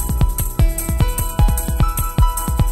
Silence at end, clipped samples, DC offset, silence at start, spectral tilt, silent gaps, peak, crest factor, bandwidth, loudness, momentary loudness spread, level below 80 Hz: 0 s; under 0.1%; under 0.1%; 0 s; -5 dB/octave; none; 0 dBFS; 16 dB; 16.5 kHz; -19 LUFS; 1 LU; -18 dBFS